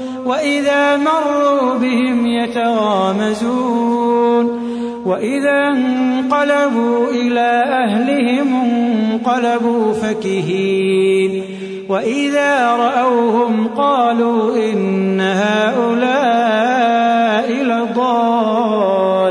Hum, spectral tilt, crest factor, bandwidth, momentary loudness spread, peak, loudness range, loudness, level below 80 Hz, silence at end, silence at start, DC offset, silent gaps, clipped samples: none; -5.5 dB/octave; 12 dB; 10.5 kHz; 4 LU; -2 dBFS; 2 LU; -15 LUFS; -60 dBFS; 0 s; 0 s; under 0.1%; none; under 0.1%